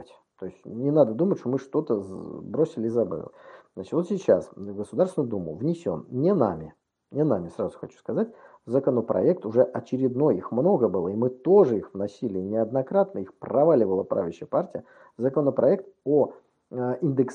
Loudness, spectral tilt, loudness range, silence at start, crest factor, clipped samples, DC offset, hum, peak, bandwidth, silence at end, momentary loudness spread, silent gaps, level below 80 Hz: -25 LUFS; -9.5 dB/octave; 4 LU; 0 s; 20 dB; under 0.1%; under 0.1%; none; -6 dBFS; 10 kHz; 0 s; 14 LU; none; -66 dBFS